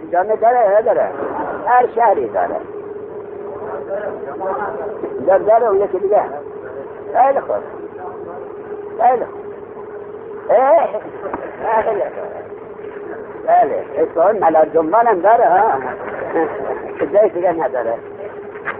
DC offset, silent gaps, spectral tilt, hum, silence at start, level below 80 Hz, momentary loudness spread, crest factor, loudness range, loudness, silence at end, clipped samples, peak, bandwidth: under 0.1%; none; -5 dB/octave; none; 0 s; -56 dBFS; 17 LU; 14 dB; 6 LU; -16 LUFS; 0 s; under 0.1%; -2 dBFS; 3.6 kHz